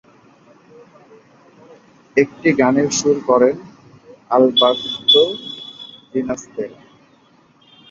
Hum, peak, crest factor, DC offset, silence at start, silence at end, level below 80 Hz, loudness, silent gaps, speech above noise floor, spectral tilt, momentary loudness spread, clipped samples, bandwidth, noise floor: none; -2 dBFS; 18 dB; under 0.1%; 2.15 s; 1.15 s; -60 dBFS; -16 LUFS; none; 37 dB; -3.5 dB/octave; 18 LU; under 0.1%; 7.8 kHz; -53 dBFS